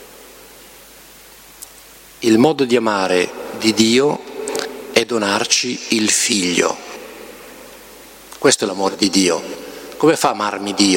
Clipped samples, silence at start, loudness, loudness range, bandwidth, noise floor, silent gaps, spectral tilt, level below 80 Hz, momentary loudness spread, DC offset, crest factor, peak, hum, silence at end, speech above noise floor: under 0.1%; 0 s; -16 LUFS; 3 LU; 17 kHz; -42 dBFS; none; -3 dB/octave; -56 dBFS; 23 LU; under 0.1%; 18 dB; 0 dBFS; none; 0 s; 26 dB